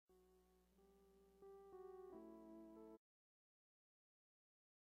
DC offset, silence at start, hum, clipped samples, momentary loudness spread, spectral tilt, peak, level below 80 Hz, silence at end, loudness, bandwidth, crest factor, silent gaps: under 0.1%; 0.1 s; 60 Hz at -85 dBFS; under 0.1%; 6 LU; -7 dB/octave; -50 dBFS; -86 dBFS; 1.9 s; -62 LUFS; 13.5 kHz; 16 dB; none